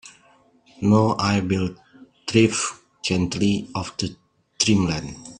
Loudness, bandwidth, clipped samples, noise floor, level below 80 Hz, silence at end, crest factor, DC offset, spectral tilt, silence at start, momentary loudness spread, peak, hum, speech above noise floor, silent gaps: -22 LUFS; 10.5 kHz; under 0.1%; -57 dBFS; -52 dBFS; 0.05 s; 22 dB; under 0.1%; -5 dB/octave; 0.05 s; 11 LU; -2 dBFS; none; 36 dB; none